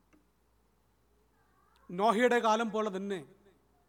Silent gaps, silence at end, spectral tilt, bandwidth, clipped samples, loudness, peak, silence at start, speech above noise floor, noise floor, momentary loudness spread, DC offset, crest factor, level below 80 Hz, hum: none; 0.65 s; -4.5 dB/octave; 17 kHz; under 0.1%; -30 LUFS; -14 dBFS; 1.9 s; 42 dB; -71 dBFS; 14 LU; under 0.1%; 20 dB; -74 dBFS; none